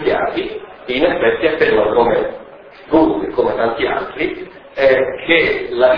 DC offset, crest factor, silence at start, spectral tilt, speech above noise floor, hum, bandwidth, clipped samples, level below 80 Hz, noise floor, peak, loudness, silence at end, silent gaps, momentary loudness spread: under 0.1%; 16 dB; 0 s; -7.5 dB/octave; 23 dB; none; 5.4 kHz; under 0.1%; -42 dBFS; -38 dBFS; 0 dBFS; -15 LUFS; 0 s; none; 11 LU